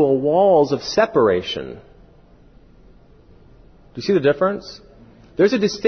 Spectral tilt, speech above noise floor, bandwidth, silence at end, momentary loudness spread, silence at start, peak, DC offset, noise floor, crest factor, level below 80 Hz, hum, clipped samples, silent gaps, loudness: -5.5 dB/octave; 31 dB; 6.6 kHz; 0 s; 20 LU; 0 s; -4 dBFS; under 0.1%; -49 dBFS; 16 dB; -50 dBFS; none; under 0.1%; none; -18 LUFS